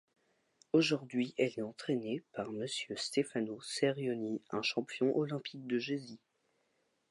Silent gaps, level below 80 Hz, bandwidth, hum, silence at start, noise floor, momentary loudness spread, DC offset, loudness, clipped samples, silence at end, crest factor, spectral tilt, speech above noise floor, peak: none; -84 dBFS; 11.5 kHz; none; 0.75 s; -78 dBFS; 8 LU; under 0.1%; -36 LUFS; under 0.1%; 0.95 s; 20 dB; -5 dB/octave; 43 dB; -16 dBFS